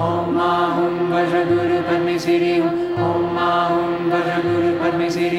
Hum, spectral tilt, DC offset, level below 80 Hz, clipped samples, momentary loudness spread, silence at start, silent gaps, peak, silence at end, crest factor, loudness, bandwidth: none; -6.5 dB/octave; under 0.1%; -54 dBFS; under 0.1%; 2 LU; 0 s; none; -6 dBFS; 0 s; 12 dB; -18 LUFS; 10 kHz